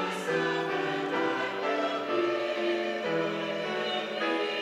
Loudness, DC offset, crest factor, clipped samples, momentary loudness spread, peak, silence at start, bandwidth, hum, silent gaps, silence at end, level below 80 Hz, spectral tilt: -30 LUFS; under 0.1%; 14 dB; under 0.1%; 2 LU; -16 dBFS; 0 s; 15 kHz; none; none; 0 s; -82 dBFS; -4.5 dB/octave